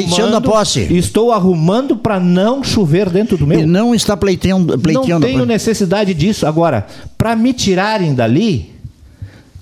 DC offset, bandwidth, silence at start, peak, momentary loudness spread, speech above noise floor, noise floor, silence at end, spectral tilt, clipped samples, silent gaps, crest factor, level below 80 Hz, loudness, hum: under 0.1%; 15 kHz; 0 s; 0 dBFS; 3 LU; 23 dB; -35 dBFS; 0.05 s; -6 dB/octave; under 0.1%; none; 12 dB; -36 dBFS; -13 LUFS; none